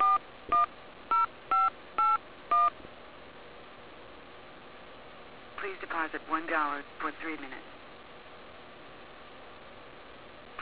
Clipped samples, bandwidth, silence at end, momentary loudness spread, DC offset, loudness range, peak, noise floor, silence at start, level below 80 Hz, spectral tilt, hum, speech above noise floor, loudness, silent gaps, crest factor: under 0.1%; 4 kHz; 0 s; 22 LU; 0.2%; 16 LU; -18 dBFS; -50 dBFS; 0 s; -66 dBFS; -1 dB/octave; none; 15 dB; -30 LUFS; none; 16 dB